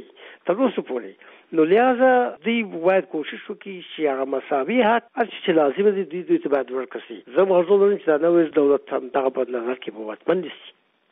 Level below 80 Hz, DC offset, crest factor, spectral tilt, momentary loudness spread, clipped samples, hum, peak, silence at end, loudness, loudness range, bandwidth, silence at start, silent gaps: -74 dBFS; under 0.1%; 14 dB; -4 dB/octave; 15 LU; under 0.1%; none; -6 dBFS; 0.4 s; -21 LUFS; 2 LU; 3.9 kHz; 0 s; none